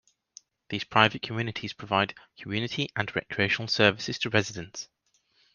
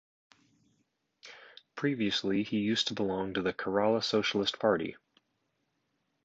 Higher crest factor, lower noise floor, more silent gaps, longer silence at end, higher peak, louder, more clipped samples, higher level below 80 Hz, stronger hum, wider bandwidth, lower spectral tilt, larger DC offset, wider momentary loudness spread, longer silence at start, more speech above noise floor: first, 28 dB vs 22 dB; second, -69 dBFS vs -79 dBFS; neither; second, 0.7 s vs 1.3 s; first, -2 dBFS vs -12 dBFS; first, -27 LUFS vs -31 LUFS; neither; about the same, -64 dBFS vs -68 dBFS; neither; second, 7.2 kHz vs 8 kHz; about the same, -4.5 dB/octave vs -4.5 dB/octave; neither; second, 15 LU vs 20 LU; second, 0.7 s vs 1.25 s; second, 41 dB vs 49 dB